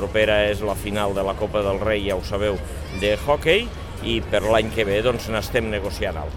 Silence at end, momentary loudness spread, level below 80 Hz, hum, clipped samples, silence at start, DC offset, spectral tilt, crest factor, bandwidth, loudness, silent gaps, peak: 0 s; 8 LU; -34 dBFS; none; under 0.1%; 0 s; 0.4%; -5 dB/octave; 18 dB; 17.5 kHz; -22 LUFS; none; -4 dBFS